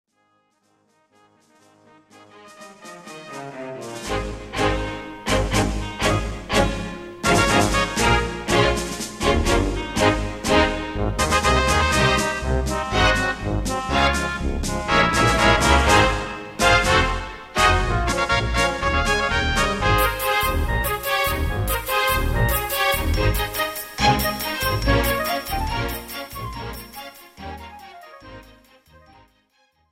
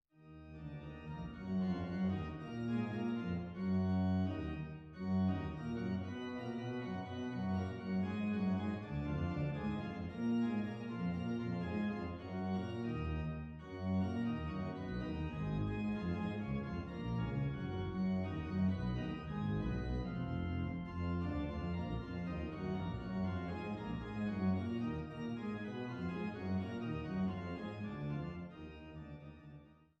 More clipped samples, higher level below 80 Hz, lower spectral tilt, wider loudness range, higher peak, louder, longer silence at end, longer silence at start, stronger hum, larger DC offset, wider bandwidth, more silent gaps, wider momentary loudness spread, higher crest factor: neither; first, -30 dBFS vs -54 dBFS; second, -4 dB/octave vs -9 dB/octave; first, 12 LU vs 3 LU; first, -2 dBFS vs -26 dBFS; first, -20 LUFS vs -40 LUFS; first, 1.5 s vs 0.25 s; first, 2.35 s vs 0.2 s; neither; neither; first, 16.5 kHz vs 6.6 kHz; neither; first, 16 LU vs 9 LU; first, 20 dB vs 14 dB